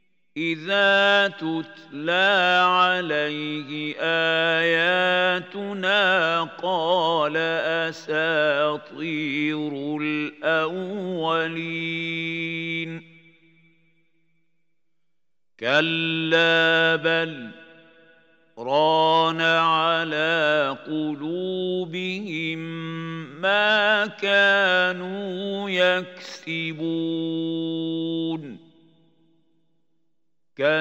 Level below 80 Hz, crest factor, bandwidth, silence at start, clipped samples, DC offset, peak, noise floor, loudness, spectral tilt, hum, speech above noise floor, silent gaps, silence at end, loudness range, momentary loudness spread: -82 dBFS; 18 dB; 15.5 kHz; 0.35 s; under 0.1%; under 0.1%; -6 dBFS; -85 dBFS; -22 LUFS; -5 dB/octave; none; 62 dB; none; 0 s; 9 LU; 12 LU